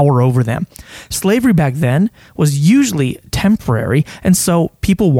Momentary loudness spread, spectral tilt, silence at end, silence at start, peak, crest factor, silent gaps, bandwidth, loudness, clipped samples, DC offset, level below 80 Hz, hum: 8 LU; -6 dB/octave; 0 s; 0 s; 0 dBFS; 14 dB; none; 16.5 kHz; -14 LUFS; under 0.1%; under 0.1%; -36 dBFS; none